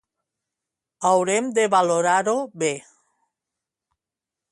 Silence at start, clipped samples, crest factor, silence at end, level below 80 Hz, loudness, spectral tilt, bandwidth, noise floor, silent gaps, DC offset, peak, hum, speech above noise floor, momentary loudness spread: 1 s; under 0.1%; 18 dB; 1.7 s; -74 dBFS; -21 LUFS; -3.5 dB/octave; 11.5 kHz; -88 dBFS; none; under 0.1%; -6 dBFS; none; 68 dB; 7 LU